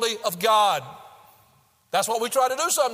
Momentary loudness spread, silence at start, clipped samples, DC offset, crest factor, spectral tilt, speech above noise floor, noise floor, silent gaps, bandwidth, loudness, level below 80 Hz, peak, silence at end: 8 LU; 0 s; under 0.1%; under 0.1%; 16 dB; -1 dB/octave; 38 dB; -61 dBFS; none; 16 kHz; -22 LUFS; -74 dBFS; -8 dBFS; 0 s